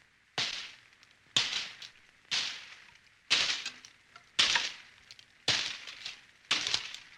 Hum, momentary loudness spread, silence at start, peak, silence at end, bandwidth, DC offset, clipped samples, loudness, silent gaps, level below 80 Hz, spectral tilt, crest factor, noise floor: none; 22 LU; 0.35 s; -10 dBFS; 0 s; 16 kHz; under 0.1%; under 0.1%; -31 LUFS; none; -74 dBFS; 0.5 dB/octave; 26 dB; -62 dBFS